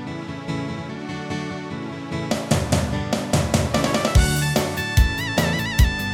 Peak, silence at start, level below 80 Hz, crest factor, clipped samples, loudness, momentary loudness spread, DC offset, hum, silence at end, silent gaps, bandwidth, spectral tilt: -2 dBFS; 0 s; -28 dBFS; 18 dB; under 0.1%; -22 LUFS; 12 LU; under 0.1%; none; 0 s; none; 18 kHz; -5 dB/octave